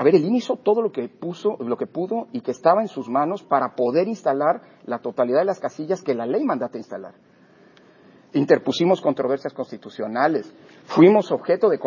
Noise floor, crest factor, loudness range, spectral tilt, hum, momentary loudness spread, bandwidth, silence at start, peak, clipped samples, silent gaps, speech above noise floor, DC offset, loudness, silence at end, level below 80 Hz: -53 dBFS; 20 dB; 5 LU; -7 dB/octave; none; 12 LU; 7.4 kHz; 0 s; -2 dBFS; under 0.1%; none; 32 dB; under 0.1%; -22 LUFS; 0 s; -74 dBFS